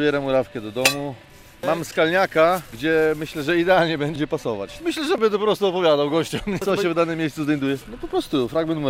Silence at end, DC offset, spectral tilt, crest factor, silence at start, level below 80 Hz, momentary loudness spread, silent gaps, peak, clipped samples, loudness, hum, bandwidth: 0 s; under 0.1%; -4.5 dB/octave; 18 dB; 0 s; -50 dBFS; 9 LU; none; -4 dBFS; under 0.1%; -21 LUFS; none; 16 kHz